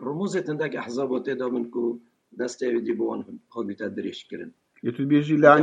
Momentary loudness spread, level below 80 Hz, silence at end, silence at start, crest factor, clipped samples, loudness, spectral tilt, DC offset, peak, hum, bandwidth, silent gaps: 15 LU; -76 dBFS; 0 s; 0 s; 24 dB; under 0.1%; -26 LUFS; -6.5 dB/octave; under 0.1%; 0 dBFS; none; 9.4 kHz; none